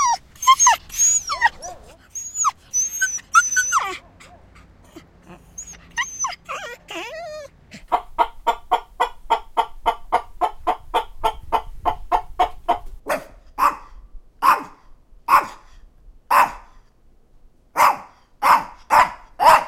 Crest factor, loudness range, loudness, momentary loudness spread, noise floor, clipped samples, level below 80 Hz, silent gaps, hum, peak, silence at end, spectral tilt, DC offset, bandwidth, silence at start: 20 dB; 8 LU; -20 LUFS; 18 LU; -52 dBFS; under 0.1%; -44 dBFS; none; none; -2 dBFS; 0 s; 0 dB/octave; under 0.1%; 16.5 kHz; 0 s